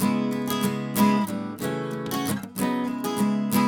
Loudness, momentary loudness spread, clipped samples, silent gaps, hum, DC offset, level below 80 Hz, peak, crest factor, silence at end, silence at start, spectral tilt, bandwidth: -26 LUFS; 8 LU; under 0.1%; none; none; under 0.1%; -64 dBFS; -8 dBFS; 16 dB; 0 s; 0 s; -5.5 dB/octave; over 20 kHz